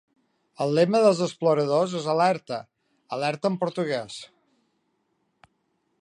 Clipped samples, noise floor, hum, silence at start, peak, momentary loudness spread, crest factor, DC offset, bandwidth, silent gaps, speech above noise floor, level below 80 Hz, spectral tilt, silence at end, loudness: under 0.1%; -73 dBFS; none; 0.6 s; -6 dBFS; 15 LU; 20 dB; under 0.1%; 11 kHz; none; 49 dB; -76 dBFS; -6 dB/octave; 1.75 s; -24 LUFS